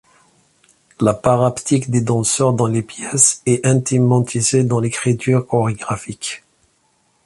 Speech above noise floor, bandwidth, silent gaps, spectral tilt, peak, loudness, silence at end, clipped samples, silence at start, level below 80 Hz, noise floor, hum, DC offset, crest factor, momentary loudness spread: 45 dB; 11.5 kHz; none; -5 dB/octave; 0 dBFS; -17 LUFS; 0.9 s; under 0.1%; 1 s; -50 dBFS; -61 dBFS; none; under 0.1%; 18 dB; 11 LU